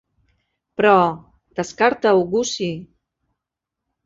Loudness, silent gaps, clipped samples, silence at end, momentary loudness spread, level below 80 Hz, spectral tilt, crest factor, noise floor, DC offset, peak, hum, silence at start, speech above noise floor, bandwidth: -18 LUFS; none; under 0.1%; 1.2 s; 19 LU; -58 dBFS; -4.5 dB/octave; 20 dB; -84 dBFS; under 0.1%; -2 dBFS; none; 0.8 s; 66 dB; 7.8 kHz